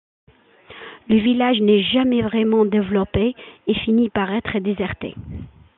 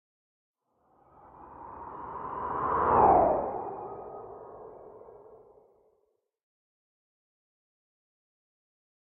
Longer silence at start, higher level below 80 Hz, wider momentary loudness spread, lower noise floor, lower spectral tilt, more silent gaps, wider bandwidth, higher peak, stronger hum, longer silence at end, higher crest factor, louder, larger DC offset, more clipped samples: second, 0.7 s vs 1.4 s; first, -46 dBFS vs -56 dBFS; second, 19 LU vs 26 LU; second, -46 dBFS vs -75 dBFS; first, -10 dB/octave vs -7.5 dB/octave; neither; first, 4.1 kHz vs 3.4 kHz; first, -6 dBFS vs -10 dBFS; neither; second, 0.3 s vs 3.75 s; second, 14 dB vs 24 dB; first, -19 LUFS vs -27 LUFS; neither; neither